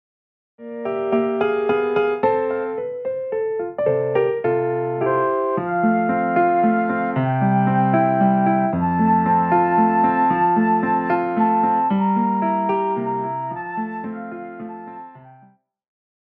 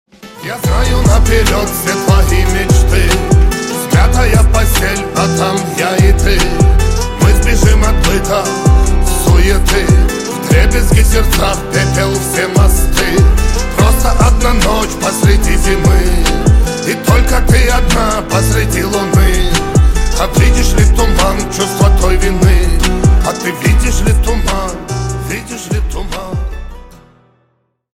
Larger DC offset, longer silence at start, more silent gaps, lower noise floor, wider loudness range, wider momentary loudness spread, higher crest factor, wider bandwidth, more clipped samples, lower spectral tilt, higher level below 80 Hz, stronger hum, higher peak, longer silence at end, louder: neither; first, 0.6 s vs 0.25 s; neither; second, -54 dBFS vs -60 dBFS; first, 6 LU vs 2 LU; first, 10 LU vs 6 LU; about the same, 14 dB vs 10 dB; second, 4.6 kHz vs 16.5 kHz; neither; first, -11 dB/octave vs -5 dB/octave; second, -58 dBFS vs -12 dBFS; neither; second, -6 dBFS vs 0 dBFS; second, 0.95 s vs 1.15 s; second, -19 LUFS vs -12 LUFS